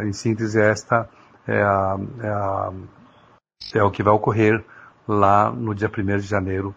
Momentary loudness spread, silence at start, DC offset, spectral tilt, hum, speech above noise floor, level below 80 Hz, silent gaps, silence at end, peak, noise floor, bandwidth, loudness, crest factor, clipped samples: 11 LU; 0 s; under 0.1%; -7 dB/octave; none; 34 dB; -54 dBFS; none; 0.05 s; 0 dBFS; -55 dBFS; 8 kHz; -21 LUFS; 20 dB; under 0.1%